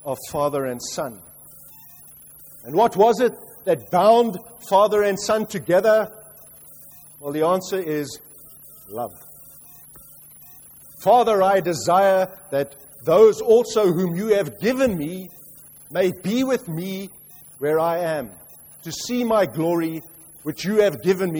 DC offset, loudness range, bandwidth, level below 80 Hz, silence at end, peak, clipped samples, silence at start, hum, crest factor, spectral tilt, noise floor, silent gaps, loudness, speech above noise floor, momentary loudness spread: under 0.1%; 9 LU; over 20 kHz; -58 dBFS; 0 s; -4 dBFS; under 0.1%; 0.05 s; none; 18 dB; -5 dB/octave; -45 dBFS; none; -20 LUFS; 26 dB; 25 LU